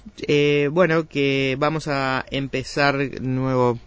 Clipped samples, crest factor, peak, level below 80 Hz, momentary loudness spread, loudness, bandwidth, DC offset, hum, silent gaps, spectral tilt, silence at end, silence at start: under 0.1%; 16 dB; -4 dBFS; -48 dBFS; 7 LU; -21 LUFS; 8 kHz; under 0.1%; none; none; -6 dB/octave; 0.05 s; 0.05 s